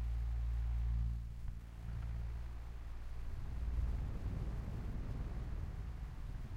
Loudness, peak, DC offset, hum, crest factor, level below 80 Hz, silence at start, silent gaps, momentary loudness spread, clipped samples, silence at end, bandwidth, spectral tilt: -44 LUFS; -28 dBFS; under 0.1%; none; 12 dB; -42 dBFS; 0 s; none; 9 LU; under 0.1%; 0 s; 6.8 kHz; -8 dB/octave